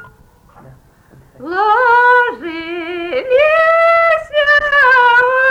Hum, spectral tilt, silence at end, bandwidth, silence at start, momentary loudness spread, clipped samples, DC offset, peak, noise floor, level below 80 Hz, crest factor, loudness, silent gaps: none; -3.5 dB/octave; 0 s; 12 kHz; 0 s; 14 LU; under 0.1%; under 0.1%; -2 dBFS; -45 dBFS; -48 dBFS; 10 dB; -11 LUFS; none